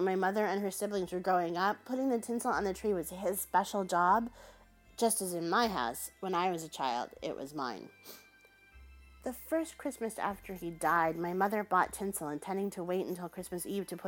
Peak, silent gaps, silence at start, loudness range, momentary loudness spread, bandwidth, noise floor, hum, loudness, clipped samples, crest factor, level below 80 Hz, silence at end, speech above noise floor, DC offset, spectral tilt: -14 dBFS; none; 0 s; 8 LU; 11 LU; 17 kHz; -62 dBFS; none; -34 LUFS; under 0.1%; 20 dB; -62 dBFS; 0 s; 28 dB; under 0.1%; -4 dB/octave